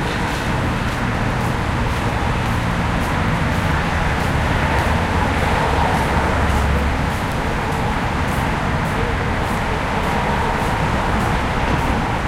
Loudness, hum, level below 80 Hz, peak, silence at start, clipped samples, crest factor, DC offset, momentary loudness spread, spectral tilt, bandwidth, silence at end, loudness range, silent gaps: -19 LUFS; none; -26 dBFS; -4 dBFS; 0 s; under 0.1%; 14 dB; under 0.1%; 3 LU; -6 dB/octave; 16 kHz; 0 s; 2 LU; none